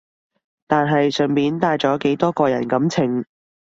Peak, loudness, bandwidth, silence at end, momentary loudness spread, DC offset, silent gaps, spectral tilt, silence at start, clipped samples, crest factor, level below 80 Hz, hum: -2 dBFS; -19 LUFS; 7.8 kHz; 0.55 s; 4 LU; under 0.1%; none; -6.5 dB/octave; 0.7 s; under 0.1%; 18 dB; -60 dBFS; none